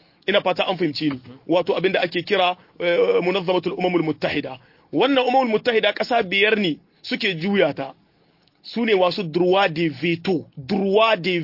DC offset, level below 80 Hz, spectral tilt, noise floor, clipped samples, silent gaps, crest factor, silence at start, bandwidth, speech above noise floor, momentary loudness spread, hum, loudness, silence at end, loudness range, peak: under 0.1%; -64 dBFS; -6.5 dB/octave; -60 dBFS; under 0.1%; none; 16 dB; 0.25 s; 5.8 kHz; 39 dB; 9 LU; none; -20 LUFS; 0 s; 2 LU; -4 dBFS